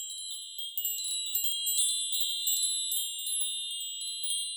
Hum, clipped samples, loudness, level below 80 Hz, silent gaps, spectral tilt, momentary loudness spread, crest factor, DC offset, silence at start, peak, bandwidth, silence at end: none; under 0.1%; -29 LUFS; under -90 dBFS; none; 11.5 dB/octave; 8 LU; 18 dB; under 0.1%; 0 s; -14 dBFS; over 20 kHz; 0 s